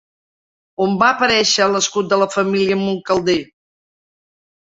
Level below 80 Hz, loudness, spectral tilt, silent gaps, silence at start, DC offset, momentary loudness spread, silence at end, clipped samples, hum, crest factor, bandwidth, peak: -56 dBFS; -16 LUFS; -3.5 dB/octave; none; 0.8 s; under 0.1%; 7 LU; 1.25 s; under 0.1%; none; 18 dB; 8 kHz; -2 dBFS